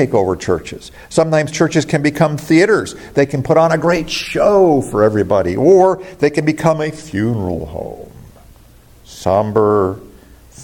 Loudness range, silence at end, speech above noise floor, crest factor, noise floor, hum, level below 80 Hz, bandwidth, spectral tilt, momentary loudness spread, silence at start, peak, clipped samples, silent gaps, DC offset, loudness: 7 LU; 0 s; 30 dB; 14 dB; -44 dBFS; none; -44 dBFS; 17 kHz; -6 dB/octave; 11 LU; 0 s; 0 dBFS; under 0.1%; none; under 0.1%; -15 LUFS